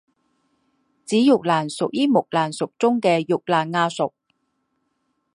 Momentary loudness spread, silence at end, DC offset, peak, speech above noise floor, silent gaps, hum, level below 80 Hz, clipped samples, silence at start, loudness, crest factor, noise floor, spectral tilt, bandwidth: 7 LU; 1.25 s; under 0.1%; -4 dBFS; 52 dB; none; none; -72 dBFS; under 0.1%; 1.1 s; -21 LUFS; 18 dB; -72 dBFS; -5.5 dB/octave; 11.5 kHz